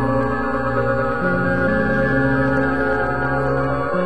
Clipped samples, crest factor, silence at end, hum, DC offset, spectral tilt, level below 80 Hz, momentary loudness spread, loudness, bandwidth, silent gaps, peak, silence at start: under 0.1%; 12 dB; 0 s; 60 Hz at -30 dBFS; 3%; -8.5 dB/octave; -36 dBFS; 3 LU; -19 LUFS; 8.4 kHz; none; -6 dBFS; 0 s